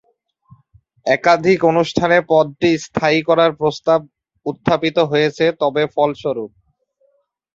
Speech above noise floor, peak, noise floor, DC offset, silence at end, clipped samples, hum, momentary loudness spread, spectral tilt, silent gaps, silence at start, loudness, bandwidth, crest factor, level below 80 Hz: 47 dB; -2 dBFS; -62 dBFS; under 0.1%; 1.1 s; under 0.1%; none; 10 LU; -5.5 dB/octave; none; 1.05 s; -16 LUFS; 7.8 kHz; 16 dB; -54 dBFS